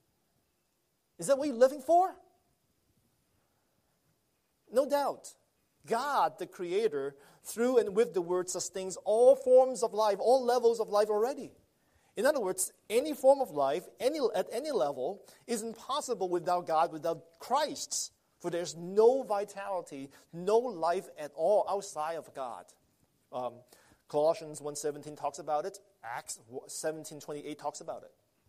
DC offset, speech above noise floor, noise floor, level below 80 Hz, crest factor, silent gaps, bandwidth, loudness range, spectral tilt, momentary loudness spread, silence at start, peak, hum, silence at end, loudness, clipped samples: under 0.1%; 47 dB; -77 dBFS; -78 dBFS; 20 dB; none; 15 kHz; 9 LU; -3.5 dB/octave; 16 LU; 1.2 s; -12 dBFS; none; 0.4 s; -31 LUFS; under 0.1%